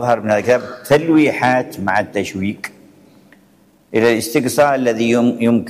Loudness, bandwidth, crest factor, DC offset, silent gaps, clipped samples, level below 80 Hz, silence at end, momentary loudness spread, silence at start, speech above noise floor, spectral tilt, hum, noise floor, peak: -16 LUFS; 15.5 kHz; 12 dB; under 0.1%; none; under 0.1%; -56 dBFS; 0 s; 9 LU; 0 s; 36 dB; -5.5 dB/octave; none; -52 dBFS; -4 dBFS